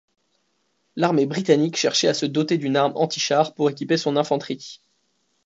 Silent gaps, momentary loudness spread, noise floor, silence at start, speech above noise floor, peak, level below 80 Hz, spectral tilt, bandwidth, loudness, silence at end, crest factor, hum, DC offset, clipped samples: none; 6 LU; -70 dBFS; 0.95 s; 49 dB; -4 dBFS; -72 dBFS; -4.5 dB/octave; 8 kHz; -21 LUFS; 0.7 s; 18 dB; none; under 0.1%; under 0.1%